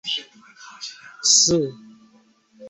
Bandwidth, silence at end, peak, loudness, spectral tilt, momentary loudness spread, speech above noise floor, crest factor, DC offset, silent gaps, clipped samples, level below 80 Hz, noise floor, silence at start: 8.4 kHz; 0 s; -4 dBFS; -18 LUFS; -1.5 dB/octave; 21 LU; 36 dB; 20 dB; under 0.1%; none; under 0.1%; -60 dBFS; -57 dBFS; 0.05 s